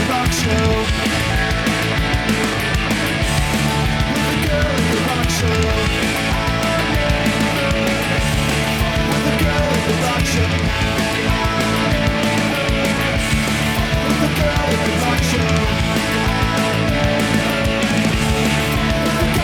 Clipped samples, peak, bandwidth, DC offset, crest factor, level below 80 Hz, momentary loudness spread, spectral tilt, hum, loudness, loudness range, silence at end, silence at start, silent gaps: under 0.1%; -4 dBFS; 19.5 kHz; under 0.1%; 12 dB; -26 dBFS; 1 LU; -4.5 dB/octave; none; -17 LUFS; 0 LU; 0 s; 0 s; none